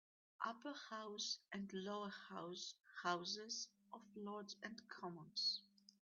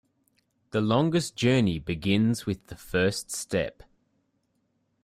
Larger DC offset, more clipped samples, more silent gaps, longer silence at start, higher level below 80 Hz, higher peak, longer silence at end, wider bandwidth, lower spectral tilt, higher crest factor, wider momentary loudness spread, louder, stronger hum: neither; neither; neither; second, 0.4 s vs 0.75 s; second, under -90 dBFS vs -54 dBFS; second, -28 dBFS vs -10 dBFS; second, 0.4 s vs 1.35 s; second, 7.2 kHz vs 15.5 kHz; second, -1.5 dB/octave vs -5.5 dB/octave; about the same, 22 dB vs 18 dB; about the same, 11 LU vs 9 LU; second, -48 LUFS vs -27 LUFS; neither